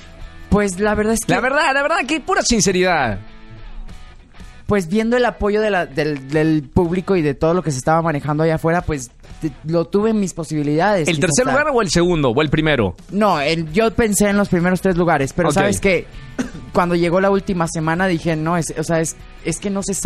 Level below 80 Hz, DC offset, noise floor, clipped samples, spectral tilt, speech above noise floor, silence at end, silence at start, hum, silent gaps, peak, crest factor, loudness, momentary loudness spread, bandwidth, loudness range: -36 dBFS; under 0.1%; -38 dBFS; under 0.1%; -5 dB/octave; 21 dB; 0 s; 0 s; none; none; -2 dBFS; 16 dB; -17 LUFS; 7 LU; 15 kHz; 3 LU